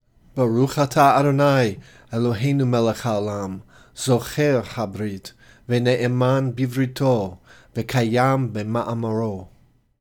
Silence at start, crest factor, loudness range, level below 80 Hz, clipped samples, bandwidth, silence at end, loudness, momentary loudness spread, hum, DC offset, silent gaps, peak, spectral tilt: 0.35 s; 18 dB; 4 LU; -54 dBFS; under 0.1%; 18.5 kHz; 0.55 s; -21 LUFS; 14 LU; none; under 0.1%; none; -4 dBFS; -6.5 dB/octave